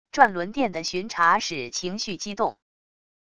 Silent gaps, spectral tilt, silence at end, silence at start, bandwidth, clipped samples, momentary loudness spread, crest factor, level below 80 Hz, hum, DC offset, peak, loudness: none; -3 dB/octave; 0.7 s; 0.05 s; 11 kHz; under 0.1%; 9 LU; 24 dB; -60 dBFS; none; 0.4%; -2 dBFS; -24 LUFS